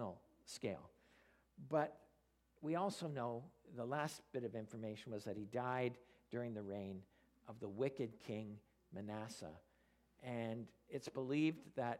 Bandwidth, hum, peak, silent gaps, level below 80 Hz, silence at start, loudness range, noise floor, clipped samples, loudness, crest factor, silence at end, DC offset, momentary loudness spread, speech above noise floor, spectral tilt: 15.5 kHz; none; -24 dBFS; none; -80 dBFS; 0 s; 4 LU; -78 dBFS; under 0.1%; -46 LUFS; 22 dB; 0 s; under 0.1%; 15 LU; 33 dB; -6 dB/octave